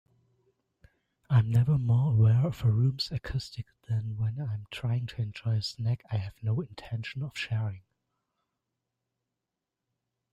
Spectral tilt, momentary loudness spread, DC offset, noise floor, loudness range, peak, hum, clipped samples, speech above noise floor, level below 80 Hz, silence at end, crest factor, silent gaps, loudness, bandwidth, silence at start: -7 dB/octave; 12 LU; under 0.1%; -87 dBFS; 11 LU; -14 dBFS; none; under 0.1%; 59 dB; -56 dBFS; 2.55 s; 16 dB; none; -30 LUFS; 8.8 kHz; 1.3 s